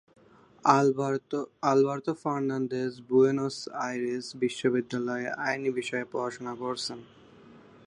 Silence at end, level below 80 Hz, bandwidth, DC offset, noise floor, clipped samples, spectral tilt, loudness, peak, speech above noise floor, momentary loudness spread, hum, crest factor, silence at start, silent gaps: 0.3 s; -74 dBFS; 11 kHz; under 0.1%; -53 dBFS; under 0.1%; -5.5 dB/octave; -29 LUFS; -6 dBFS; 25 dB; 10 LU; none; 22 dB; 0.65 s; none